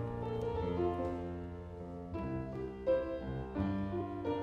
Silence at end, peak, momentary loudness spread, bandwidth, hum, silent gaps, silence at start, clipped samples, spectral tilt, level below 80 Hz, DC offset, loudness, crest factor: 0 s; -22 dBFS; 10 LU; 8.8 kHz; none; none; 0 s; under 0.1%; -9 dB/octave; -52 dBFS; under 0.1%; -38 LUFS; 16 dB